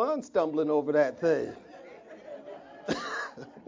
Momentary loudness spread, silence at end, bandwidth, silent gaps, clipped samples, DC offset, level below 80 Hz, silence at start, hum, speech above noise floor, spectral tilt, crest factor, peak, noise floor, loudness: 22 LU; 0.05 s; 7.6 kHz; none; under 0.1%; under 0.1%; -70 dBFS; 0 s; none; 20 dB; -5.5 dB/octave; 18 dB; -12 dBFS; -48 dBFS; -29 LUFS